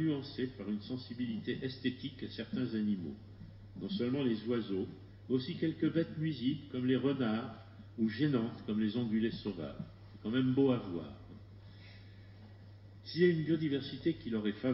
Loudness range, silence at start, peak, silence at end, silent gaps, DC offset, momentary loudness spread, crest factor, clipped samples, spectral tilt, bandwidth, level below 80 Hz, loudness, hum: 3 LU; 0 s; -16 dBFS; 0 s; none; under 0.1%; 21 LU; 18 dB; under 0.1%; -6 dB/octave; 5.8 kHz; -64 dBFS; -36 LUFS; none